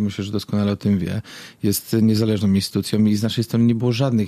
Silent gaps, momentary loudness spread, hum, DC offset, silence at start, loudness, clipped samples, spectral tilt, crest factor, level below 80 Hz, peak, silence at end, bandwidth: none; 8 LU; none; under 0.1%; 0 s; -20 LUFS; under 0.1%; -6.5 dB/octave; 12 dB; -54 dBFS; -8 dBFS; 0 s; 15.5 kHz